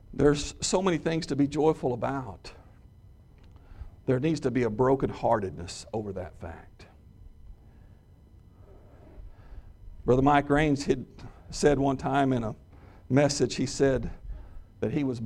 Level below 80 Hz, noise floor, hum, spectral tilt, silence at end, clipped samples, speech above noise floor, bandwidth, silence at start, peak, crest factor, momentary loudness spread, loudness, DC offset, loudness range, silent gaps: -46 dBFS; -54 dBFS; none; -5.5 dB/octave; 0 s; under 0.1%; 28 dB; 11.5 kHz; 0.1 s; -8 dBFS; 20 dB; 20 LU; -27 LUFS; under 0.1%; 9 LU; none